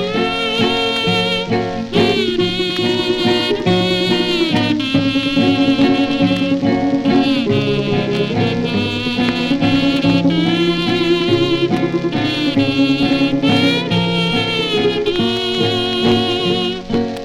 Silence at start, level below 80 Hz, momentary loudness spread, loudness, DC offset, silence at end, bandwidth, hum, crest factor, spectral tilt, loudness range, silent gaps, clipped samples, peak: 0 s; -40 dBFS; 3 LU; -15 LUFS; under 0.1%; 0 s; 12 kHz; none; 14 dB; -6 dB/octave; 1 LU; none; under 0.1%; 0 dBFS